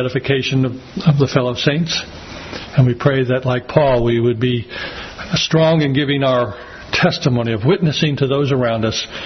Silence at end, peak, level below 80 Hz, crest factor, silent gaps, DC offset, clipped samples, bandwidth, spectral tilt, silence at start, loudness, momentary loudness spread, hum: 0 s; 0 dBFS; -42 dBFS; 16 dB; none; under 0.1%; under 0.1%; 6.4 kHz; -6 dB/octave; 0 s; -16 LUFS; 10 LU; none